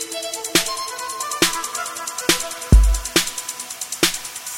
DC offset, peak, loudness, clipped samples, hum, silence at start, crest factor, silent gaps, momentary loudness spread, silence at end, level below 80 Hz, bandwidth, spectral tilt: under 0.1%; 0 dBFS; -20 LUFS; under 0.1%; none; 0 s; 20 dB; none; 11 LU; 0 s; -24 dBFS; 16.5 kHz; -2.5 dB/octave